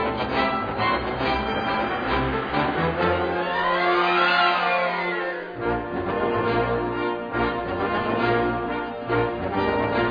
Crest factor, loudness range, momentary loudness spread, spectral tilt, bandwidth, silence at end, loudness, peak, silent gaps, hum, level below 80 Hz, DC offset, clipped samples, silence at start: 16 dB; 3 LU; 7 LU; -7.5 dB/octave; 5.2 kHz; 0 s; -23 LUFS; -8 dBFS; none; none; -42 dBFS; under 0.1%; under 0.1%; 0 s